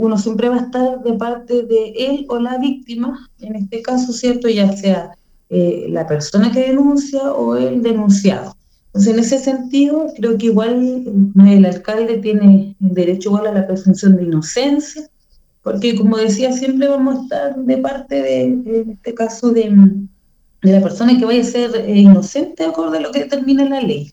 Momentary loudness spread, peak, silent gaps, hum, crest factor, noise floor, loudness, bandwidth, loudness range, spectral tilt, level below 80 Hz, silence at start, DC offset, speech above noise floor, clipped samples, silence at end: 11 LU; 0 dBFS; none; none; 14 dB; -53 dBFS; -14 LUFS; 8 kHz; 6 LU; -7 dB/octave; -52 dBFS; 0 s; under 0.1%; 39 dB; 0.1%; 0.05 s